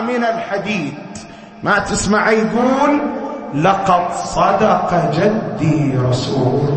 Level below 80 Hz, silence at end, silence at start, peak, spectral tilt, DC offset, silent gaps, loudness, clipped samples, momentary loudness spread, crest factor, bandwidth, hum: -42 dBFS; 0 s; 0 s; -2 dBFS; -6 dB/octave; under 0.1%; none; -16 LUFS; under 0.1%; 10 LU; 14 dB; 8.8 kHz; none